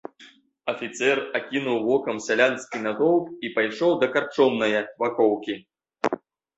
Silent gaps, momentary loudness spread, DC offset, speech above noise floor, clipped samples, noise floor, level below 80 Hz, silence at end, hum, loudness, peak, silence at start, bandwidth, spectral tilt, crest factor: none; 9 LU; under 0.1%; 29 dB; under 0.1%; -53 dBFS; -70 dBFS; 0.4 s; none; -24 LUFS; -4 dBFS; 0.2 s; 8.2 kHz; -4.5 dB/octave; 20 dB